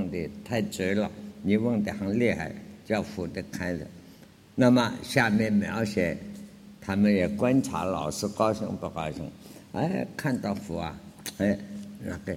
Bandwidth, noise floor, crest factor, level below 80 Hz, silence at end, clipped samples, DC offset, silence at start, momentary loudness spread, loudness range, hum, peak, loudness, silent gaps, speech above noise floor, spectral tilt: 16.5 kHz; -52 dBFS; 22 dB; -56 dBFS; 0 s; under 0.1%; under 0.1%; 0 s; 15 LU; 6 LU; none; -6 dBFS; -28 LUFS; none; 25 dB; -6 dB/octave